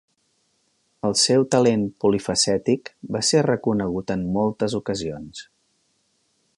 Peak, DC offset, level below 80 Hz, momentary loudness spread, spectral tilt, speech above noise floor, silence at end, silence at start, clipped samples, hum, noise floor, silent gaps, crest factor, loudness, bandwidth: -6 dBFS; under 0.1%; -54 dBFS; 12 LU; -4 dB/octave; 47 dB; 1.15 s; 1.05 s; under 0.1%; none; -68 dBFS; none; 18 dB; -21 LUFS; 11.5 kHz